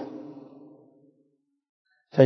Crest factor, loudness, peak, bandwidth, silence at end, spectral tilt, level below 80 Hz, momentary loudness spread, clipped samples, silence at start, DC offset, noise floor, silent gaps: 24 dB; -37 LUFS; -4 dBFS; 6.2 kHz; 0 s; -7.5 dB/octave; -84 dBFS; 22 LU; under 0.1%; 0 s; under 0.1%; -70 dBFS; 1.69-1.85 s